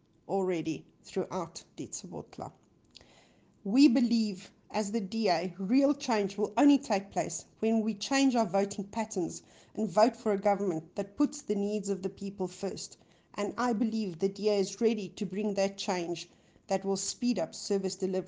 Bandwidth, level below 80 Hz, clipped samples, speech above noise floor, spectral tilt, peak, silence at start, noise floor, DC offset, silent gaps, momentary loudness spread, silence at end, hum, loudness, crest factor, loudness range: 10 kHz; -70 dBFS; under 0.1%; 32 dB; -5 dB/octave; -12 dBFS; 0.3 s; -62 dBFS; under 0.1%; none; 14 LU; 0 s; none; -31 LUFS; 20 dB; 5 LU